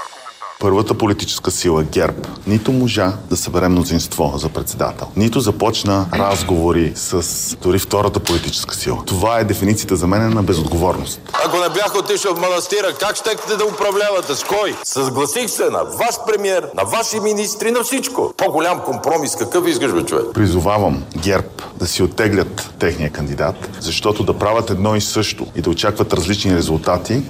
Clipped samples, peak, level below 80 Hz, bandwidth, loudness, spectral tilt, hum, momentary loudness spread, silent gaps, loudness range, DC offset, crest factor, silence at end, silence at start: under 0.1%; -2 dBFS; -36 dBFS; 16 kHz; -17 LUFS; -4.5 dB/octave; none; 5 LU; none; 1 LU; under 0.1%; 16 dB; 0 s; 0 s